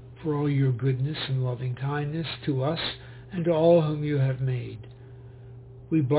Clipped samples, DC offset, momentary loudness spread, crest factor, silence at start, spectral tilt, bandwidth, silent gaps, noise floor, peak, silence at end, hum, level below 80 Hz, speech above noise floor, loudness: under 0.1%; under 0.1%; 24 LU; 18 dB; 0 s; -11.5 dB/octave; 4 kHz; none; -45 dBFS; -10 dBFS; 0 s; none; -54 dBFS; 20 dB; -26 LUFS